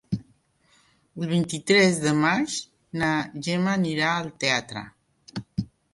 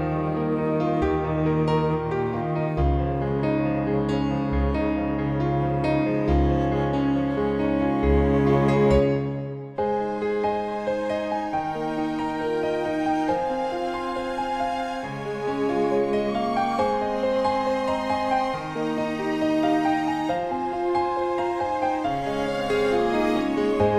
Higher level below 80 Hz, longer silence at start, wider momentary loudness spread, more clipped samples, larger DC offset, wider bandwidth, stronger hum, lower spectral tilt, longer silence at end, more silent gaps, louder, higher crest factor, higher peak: second, -58 dBFS vs -36 dBFS; about the same, 0.1 s vs 0 s; first, 17 LU vs 6 LU; neither; neither; about the same, 11.5 kHz vs 12 kHz; neither; second, -4.5 dB/octave vs -7.5 dB/octave; first, 0.3 s vs 0 s; neither; about the same, -24 LUFS vs -24 LUFS; about the same, 20 dB vs 16 dB; about the same, -6 dBFS vs -6 dBFS